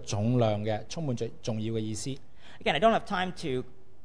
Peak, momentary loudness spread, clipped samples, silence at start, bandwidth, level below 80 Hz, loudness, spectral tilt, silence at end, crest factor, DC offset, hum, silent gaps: -12 dBFS; 11 LU; under 0.1%; 0 s; 10.5 kHz; -54 dBFS; -30 LUFS; -5.5 dB/octave; 0.35 s; 18 dB; 1%; none; none